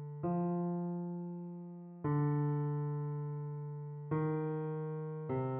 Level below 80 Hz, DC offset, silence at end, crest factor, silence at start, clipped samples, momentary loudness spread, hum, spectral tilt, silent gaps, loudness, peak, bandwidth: -72 dBFS; under 0.1%; 0 s; 14 dB; 0 s; under 0.1%; 10 LU; none; -11.5 dB/octave; none; -38 LUFS; -24 dBFS; 3.2 kHz